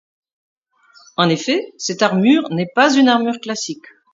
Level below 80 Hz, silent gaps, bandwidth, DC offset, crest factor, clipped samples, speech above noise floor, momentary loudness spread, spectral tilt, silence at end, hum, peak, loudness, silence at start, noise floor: -68 dBFS; none; 7.8 kHz; under 0.1%; 18 dB; under 0.1%; 35 dB; 12 LU; -4.5 dB/octave; 0.35 s; none; 0 dBFS; -16 LUFS; 1.2 s; -51 dBFS